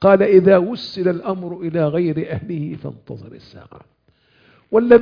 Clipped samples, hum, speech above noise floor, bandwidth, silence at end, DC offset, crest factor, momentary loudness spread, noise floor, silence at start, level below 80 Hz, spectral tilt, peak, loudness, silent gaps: under 0.1%; none; 41 dB; 5.2 kHz; 0 s; under 0.1%; 18 dB; 21 LU; -58 dBFS; 0 s; -52 dBFS; -9 dB/octave; 0 dBFS; -17 LUFS; none